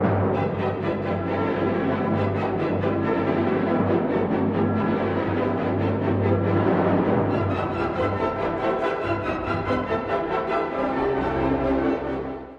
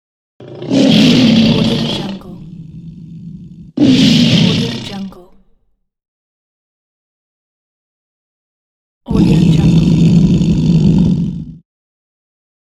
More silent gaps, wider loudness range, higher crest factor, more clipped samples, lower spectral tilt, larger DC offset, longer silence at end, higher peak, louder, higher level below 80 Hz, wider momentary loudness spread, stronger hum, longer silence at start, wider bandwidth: second, none vs 6.08-9.01 s; second, 2 LU vs 7 LU; about the same, 14 dB vs 14 dB; neither; first, -9 dB/octave vs -6.5 dB/octave; neither; second, 0 s vs 1.2 s; second, -8 dBFS vs 0 dBFS; second, -24 LUFS vs -11 LUFS; second, -46 dBFS vs -32 dBFS; second, 4 LU vs 23 LU; neither; second, 0 s vs 0.4 s; second, 6.8 kHz vs 11.5 kHz